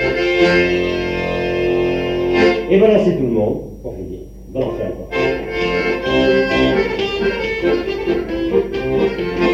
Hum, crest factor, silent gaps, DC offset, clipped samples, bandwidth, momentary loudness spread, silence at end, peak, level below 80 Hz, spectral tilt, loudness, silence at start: none; 14 dB; none; under 0.1%; under 0.1%; 8 kHz; 10 LU; 0 s; -2 dBFS; -36 dBFS; -6.5 dB/octave; -17 LUFS; 0 s